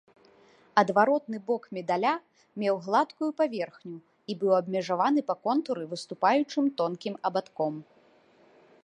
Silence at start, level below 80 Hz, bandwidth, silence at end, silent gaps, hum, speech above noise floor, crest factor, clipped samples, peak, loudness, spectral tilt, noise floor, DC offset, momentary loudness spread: 0.75 s; -82 dBFS; 10.5 kHz; 1 s; none; none; 33 dB; 22 dB; under 0.1%; -8 dBFS; -28 LUFS; -6 dB/octave; -61 dBFS; under 0.1%; 12 LU